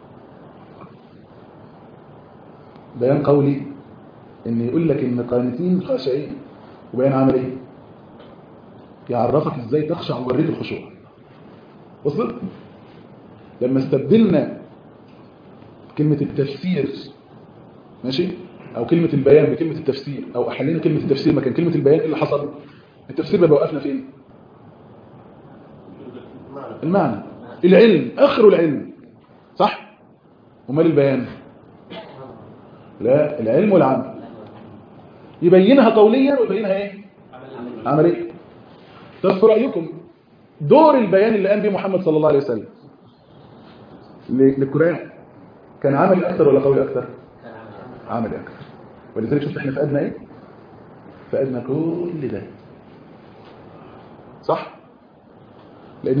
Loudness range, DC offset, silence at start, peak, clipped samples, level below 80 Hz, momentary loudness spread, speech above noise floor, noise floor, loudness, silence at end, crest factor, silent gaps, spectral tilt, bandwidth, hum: 10 LU; under 0.1%; 0.45 s; 0 dBFS; under 0.1%; -58 dBFS; 24 LU; 33 dB; -50 dBFS; -18 LUFS; 0 s; 20 dB; none; -10 dB/octave; 5.2 kHz; none